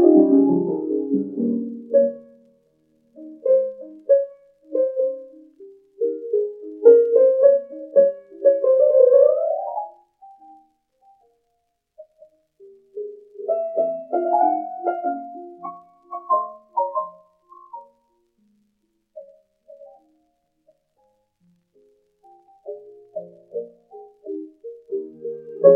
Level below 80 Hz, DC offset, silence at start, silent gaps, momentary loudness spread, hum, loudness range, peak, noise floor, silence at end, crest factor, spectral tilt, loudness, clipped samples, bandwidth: -82 dBFS; under 0.1%; 0 s; none; 23 LU; none; 21 LU; 0 dBFS; -72 dBFS; 0 s; 22 dB; -12 dB/octave; -20 LUFS; under 0.1%; 2.2 kHz